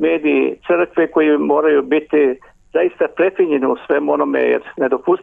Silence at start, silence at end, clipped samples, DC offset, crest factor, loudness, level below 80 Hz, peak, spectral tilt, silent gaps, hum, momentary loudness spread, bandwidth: 0 s; 0 s; under 0.1%; under 0.1%; 12 dB; -16 LUFS; -58 dBFS; -4 dBFS; -8 dB/octave; none; none; 4 LU; 3.8 kHz